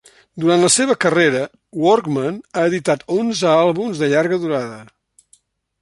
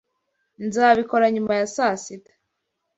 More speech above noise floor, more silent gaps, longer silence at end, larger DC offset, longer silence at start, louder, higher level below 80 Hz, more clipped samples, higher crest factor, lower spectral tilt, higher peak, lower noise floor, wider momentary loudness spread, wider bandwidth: second, 40 dB vs 57 dB; neither; first, 1 s vs 0.8 s; neither; second, 0.35 s vs 0.6 s; first, -17 LUFS vs -20 LUFS; about the same, -62 dBFS vs -64 dBFS; neither; about the same, 16 dB vs 20 dB; about the same, -4 dB/octave vs -4.5 dB/octave; about the same, -2 dBFS vs -4 dBFS; second, -57 dBFS vs -77 dBFS; second, 9 LU vs 14 LU; first, 11.5 kHz vs 8 kHz